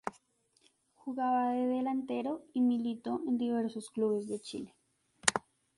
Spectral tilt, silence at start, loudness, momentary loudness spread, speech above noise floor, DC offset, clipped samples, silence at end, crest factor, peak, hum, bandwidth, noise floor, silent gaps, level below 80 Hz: -3.5 dB/octave; 0.05 s; -33 LUFS; 12 LU; 38 dB; under 0.1%; under 0.1%; 0.4 s; 32 dB; -4 dBFS; none; 11.5 kHz; -71 dBFS; none; -76 dBFS